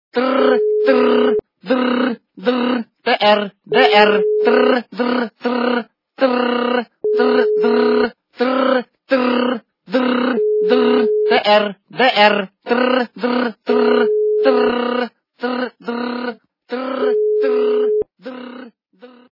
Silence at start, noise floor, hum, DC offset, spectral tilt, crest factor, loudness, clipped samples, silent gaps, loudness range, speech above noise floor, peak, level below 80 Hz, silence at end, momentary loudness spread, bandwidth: 0.15 s; -45 dBFS; none; under 0.1%; -6.5 dB/octave; 16 dB; -16 LUFS; under 0.1%; none; 5 LU; 30 dB; 0 dBFS; -66 dBFS; 0.25 s; 10 LU; 5.8 kHz